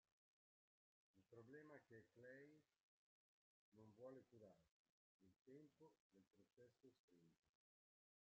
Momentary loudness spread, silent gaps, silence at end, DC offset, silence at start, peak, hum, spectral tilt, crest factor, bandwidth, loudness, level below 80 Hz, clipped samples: 5 LU; 2.80-3.72 s, 4.71-5.20 s, 5.41-5.45 s, 6.00-6.10 s, 6.99-7.08 s, 7.39-7.43 s; 0.85 s; under 0.1%; 1.15 s; -50 dBFS; none; -6 dB/octave; 20 dB; 6.4 kHz; -66 LUFS; under -90 dBFS; under 0.1%